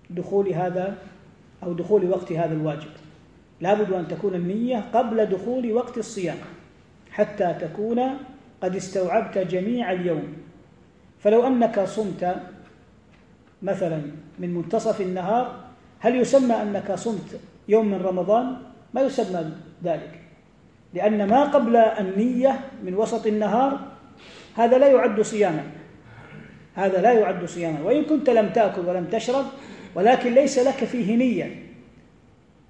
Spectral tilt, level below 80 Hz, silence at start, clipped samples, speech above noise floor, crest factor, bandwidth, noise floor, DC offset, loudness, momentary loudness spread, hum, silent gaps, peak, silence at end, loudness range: -6.5 dB/octave; -62 dBFS; 0.1 s; under 0.1%; 33 dB; 18 dB; 10 kHz; -54 dBFS; under 0.1%; -23 LUFS; 16 LU; none; none; -4 dBFS; 0.9 s; 6 LU